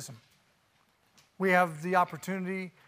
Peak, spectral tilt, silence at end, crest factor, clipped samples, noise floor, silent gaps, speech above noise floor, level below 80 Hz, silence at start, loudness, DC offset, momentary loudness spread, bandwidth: -10 dBFS; -5.5 dB/octave; 0.2 s; 22 dB; under 0.1%; -69 dBFS; none; 39 dB; -80 dBFS; 0 s; -29 LUFS; under 0.1%; 11 LU; 15.5 kHz